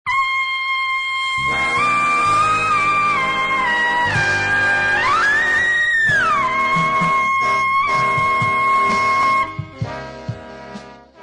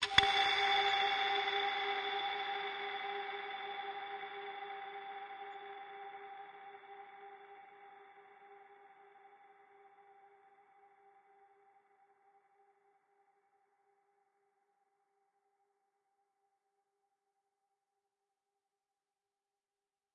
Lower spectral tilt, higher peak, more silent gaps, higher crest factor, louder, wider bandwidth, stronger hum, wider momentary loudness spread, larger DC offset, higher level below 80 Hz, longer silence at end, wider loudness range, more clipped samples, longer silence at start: first, -3.5 dB/octave vs -1.5 dB/octave; about the same, -8 dBFS vs -10 dBFS; neither; second, 10 dB vs 32 dB; first, -16 LUFS vs -36 LUFS; about the same, 10.5 kHz vs 9.6 kHz; neither; second, 14 LU vs 24 LU; neither; first, -46 dBFS vs -74 dBFS; second, 0 s vs 9.85 s; second, 2 LU vs 26 LU; neither; about the same, 0.05 s vs 0 s